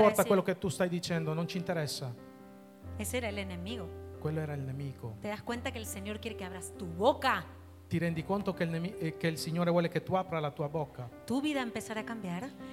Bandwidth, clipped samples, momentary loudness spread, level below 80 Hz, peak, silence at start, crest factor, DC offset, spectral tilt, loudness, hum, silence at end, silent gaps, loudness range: 16.5 kHz; under 0.1%; 12 LU; -60 dBFS; -10 dBFS; 0 s; 22 dB; under 0.1%; -5.5 dB/octave; -34 LUFS; none; 0 s; none; 6 LU